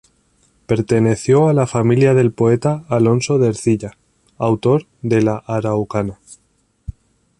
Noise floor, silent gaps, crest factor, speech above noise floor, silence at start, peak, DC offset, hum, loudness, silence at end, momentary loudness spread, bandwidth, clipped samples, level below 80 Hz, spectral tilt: -58 dBFS; none; 14 dB; 43 dB; 0.7 s; -2 dBFS; under 0.1%; none; -16 LUFS; 0.5 s; 11 LU; 11.5 kHz; under 0.1%; -46 dBFS; -7.5 dB/octave